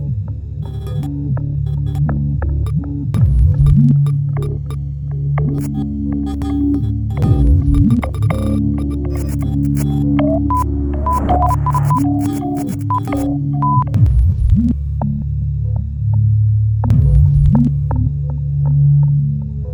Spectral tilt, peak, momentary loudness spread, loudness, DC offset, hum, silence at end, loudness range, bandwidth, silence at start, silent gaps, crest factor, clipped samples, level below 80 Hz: -9.5 dB/octave; 0 dBFS; 8 LU; -16 LUFS; under 0.1%; none; 0 s; 3 LU; 20 kHz; 0 s; none; 14 dB; under 0.1%; -20 dBFS